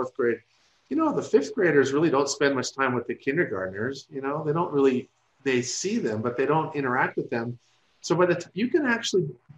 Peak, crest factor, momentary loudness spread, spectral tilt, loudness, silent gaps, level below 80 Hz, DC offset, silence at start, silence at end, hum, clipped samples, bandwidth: -6 dBFS; 20 dB; 9 LU; -5 dB/octave; -25 LUFS; none; -70 dBFS; under 0.1%; 0 s; 0.25 s; none; under 0.1%; 10.5 kHz